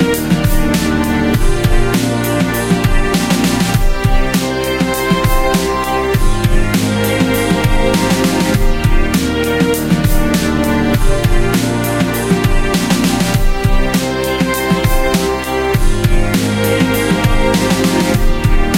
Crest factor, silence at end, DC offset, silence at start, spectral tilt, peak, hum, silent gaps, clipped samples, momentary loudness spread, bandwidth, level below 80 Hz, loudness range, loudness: 12 dB; 0 s; under 0.1%; 0 s; -5 dB/octave; 0 dBFS; none; none; under 0.1%; 2 LU; 16.5 kHz; -16 dBFS; 1 LU; -14 LUFS